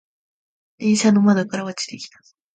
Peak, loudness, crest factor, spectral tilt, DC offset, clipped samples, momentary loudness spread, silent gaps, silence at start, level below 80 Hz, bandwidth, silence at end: -4 dBFS; -19 LUFS; 18 dB; -5 dB/octave; under 0.1%; under 0.1%; 17 LU; none; 0.8 s; -68 dBFS; 9.2 kHz; 0.5 s